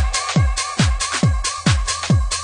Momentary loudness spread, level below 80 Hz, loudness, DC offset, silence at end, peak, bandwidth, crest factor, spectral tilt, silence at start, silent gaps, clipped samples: 1 LU; -24 dBFS; -19 LUFS; under 0.1%; 0 s; -4 dBFS; 10.5 kHz; 14 dB; -4 dB/octave; 0 s; none; under 0.1%